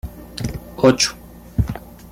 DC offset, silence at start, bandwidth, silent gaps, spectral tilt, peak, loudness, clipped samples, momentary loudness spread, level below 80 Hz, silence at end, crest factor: under 0.1%; 0.05 s; 16 kHz; none; -4.5 dB/octave; -2 dBFS; -20 LUFS; under 0.1%; 19 LU; -34 dBFS; 0 s; 20 dB